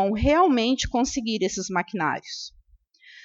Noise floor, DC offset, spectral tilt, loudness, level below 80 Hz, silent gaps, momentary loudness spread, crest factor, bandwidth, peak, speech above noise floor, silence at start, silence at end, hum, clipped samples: -57 dBFS; under 0.1%; -4 dB/octave; -23 LUFS; -40 dBFS; none; 15 LU; 16 dB; 8 kHz; -8 dBFS; 34 dB; 0 s; 0.05 s; none; under 0.1%